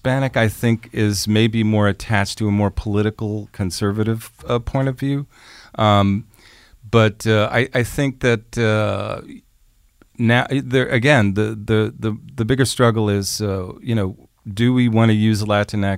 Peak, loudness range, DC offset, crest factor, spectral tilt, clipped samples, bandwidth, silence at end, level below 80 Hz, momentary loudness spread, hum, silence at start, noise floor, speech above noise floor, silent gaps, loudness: 0 dBFS; 3 LU; under 0.1%; 18 dB; -6 dB/octave; under 0.1%; 16 kHz; 0 s; -42 dBFS; 10 LU; none; 0.05 s; -55 dBFS; 37 dB; none; -19 LUFS